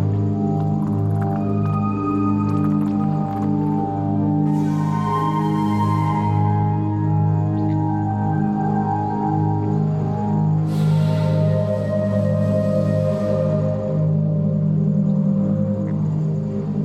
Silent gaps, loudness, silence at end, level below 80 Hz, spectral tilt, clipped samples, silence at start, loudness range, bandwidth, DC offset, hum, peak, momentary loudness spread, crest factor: none; -20 LUFS; 0 s; -50 dBFS; -10 dB/octave; under 0.1%; 0 s; 1 LU; 7.4 kHz; under 0.1%; none; -8 dBFS; 3 LU; 12 dB